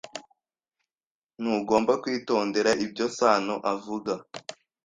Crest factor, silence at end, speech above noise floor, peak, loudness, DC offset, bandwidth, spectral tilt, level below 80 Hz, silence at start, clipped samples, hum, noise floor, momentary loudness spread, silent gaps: 22 dB; 0.3 s; over 65 dB; -6 dBFS; -26 LUFS; under 0.1%; 9.8 kHz; -4 dB/octave; -68 dBFS; 0.05 s; under 0.1%; none; under -90 dBFS; 18 LU; 1.07-1.22 s